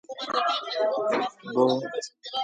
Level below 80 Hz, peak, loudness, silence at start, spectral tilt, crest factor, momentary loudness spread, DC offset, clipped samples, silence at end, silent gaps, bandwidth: -78 dBFS; -10 dBFS; -27 LUFS; 0.1 s; -4 dB/octave; 18 dB; 9 LU; under 0.1%; under 0.1%; 0 s; none; 9.4 kHz